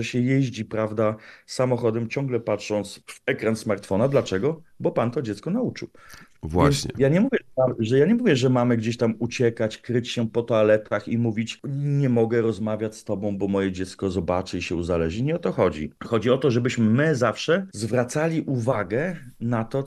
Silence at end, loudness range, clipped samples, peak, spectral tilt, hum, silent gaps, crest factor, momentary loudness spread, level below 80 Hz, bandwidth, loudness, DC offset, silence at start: 0 s; 4 LU; under 0.1%; -4 dBFS; -6.5 dB/octave; none; none; 20 dB; 8 LU; -52 dBFS; 12.5 kHz; -24 LUFS; under 0.1%; 0 s